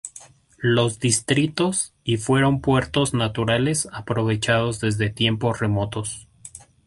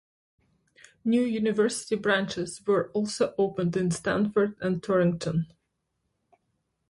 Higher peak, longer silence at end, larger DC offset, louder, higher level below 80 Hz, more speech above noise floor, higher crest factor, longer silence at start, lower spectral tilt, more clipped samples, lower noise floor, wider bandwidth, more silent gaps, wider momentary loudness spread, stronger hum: first, -4 dBFS vs -12 dBFS; second, 0.3 s vs 1.45 s; neither; first, -22 LUFS vs -27 LUFS; first, -48 dBFS vs -62 dBFS; second, 26 dB vs 52 dB; about the same, 18 dB vs 16 dB; second, 0.05 s vs 1.05 s; about the same, -4.5 dB/octave vs -5.5 dB/octave; neither; second, -47 dBFS vs -78 dBFS; about the same, 11.5 kHz vs 11.5 kHz; neither; first, 10 LU vs 6 LU; neither